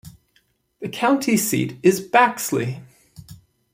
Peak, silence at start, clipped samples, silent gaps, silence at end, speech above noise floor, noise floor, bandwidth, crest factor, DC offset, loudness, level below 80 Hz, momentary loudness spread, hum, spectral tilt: -2 dBFS; 0.05 s; under 0.1%; none; 0.4 s; 45 dB; -64 dBFS; 16 kHz; 20 dB; under 0.1%; -19 LUFS; -60 dBFS; 15 LU; none; -4.5 dB/octave